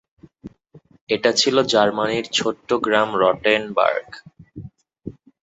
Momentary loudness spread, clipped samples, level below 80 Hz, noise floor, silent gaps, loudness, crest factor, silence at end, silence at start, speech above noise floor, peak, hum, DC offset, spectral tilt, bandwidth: 23 LU; under 0.1%; -58 dBFS; -51 dBFS; 1.01-1.07 s; -19 LUFS; 18 dB; 0.3 s; 0.45 s; 32 dB; -2 dBFS; none; under 0.1%; -3 dB/octave; 8.2 kHz